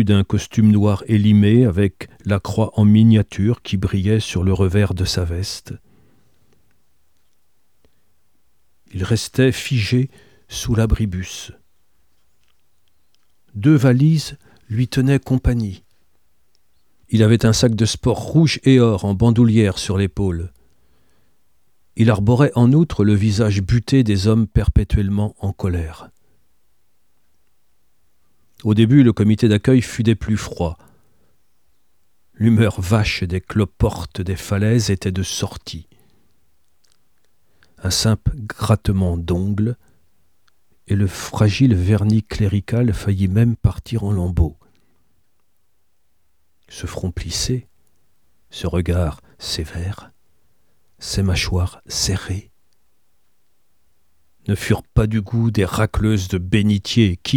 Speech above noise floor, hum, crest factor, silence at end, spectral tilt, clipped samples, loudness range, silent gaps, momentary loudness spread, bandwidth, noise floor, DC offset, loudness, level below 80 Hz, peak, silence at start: 53 dB; none; 18 dB; 0 s; -6.5 dB/octave; under 0.1%; 10 LU; none; 13 LU; 15 kHz; -70 dBFS; 0.2%; -18 LUFS; -34 dBFS; 0 dBFS; 0 s